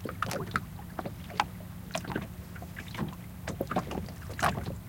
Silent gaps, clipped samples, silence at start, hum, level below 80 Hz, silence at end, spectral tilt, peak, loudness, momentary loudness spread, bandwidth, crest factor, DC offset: none; under 0.1%; 0 s; none; -50 dBFS; 0 s; -5 dB/octave; -10 dBFS; -36 LUFS; 11 LU; 17 kHz; 26 dB; under 0.1%